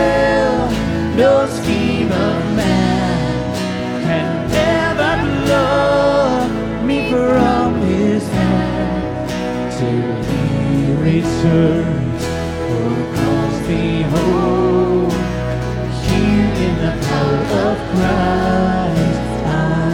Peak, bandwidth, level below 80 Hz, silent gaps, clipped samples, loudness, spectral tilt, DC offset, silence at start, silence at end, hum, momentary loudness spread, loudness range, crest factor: -2 dBFS; 17 kHz; -32 dBFS; none; under 0.1%; -16 LUFS; -6.5 dB/octave; under 0.1%; 0 s; 0 s; none; 6 LU; 2 LU; 12 dB